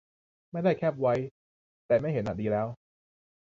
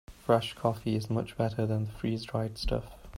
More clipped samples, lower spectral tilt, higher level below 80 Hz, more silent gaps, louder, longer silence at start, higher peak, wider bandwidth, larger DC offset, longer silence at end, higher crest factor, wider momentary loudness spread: neither; first, -9 dB/octave vs -7 dB/octave; second, -60 dBFS vs -44 dBFS; first, 1.31-1.89 s vs none; first, -29 LUFS vs -32 LUFS; first, 0.55 s vs 0.1 s; about the same, -14 dBFS vs -12 dBFS; second, 7.4 kHz vs 16 kHz; neither; first, 0.85 s vs 0 s; about the same, 18 dB vs 20 dB; first, 12 LU vs 6 LU